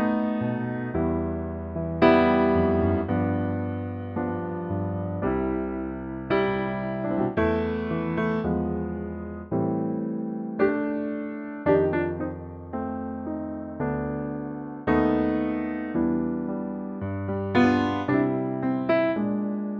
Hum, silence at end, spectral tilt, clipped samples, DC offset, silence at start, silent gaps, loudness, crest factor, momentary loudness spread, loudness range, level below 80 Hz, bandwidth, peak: none; 0 s; -9.5 dB/octave; under 0.1%; under 0.1%; 0 s; none; -26 LUFS; 20 dB; 10 LU; 5 LU; -46 dBFS; 6.4 kHz; -6 dBFS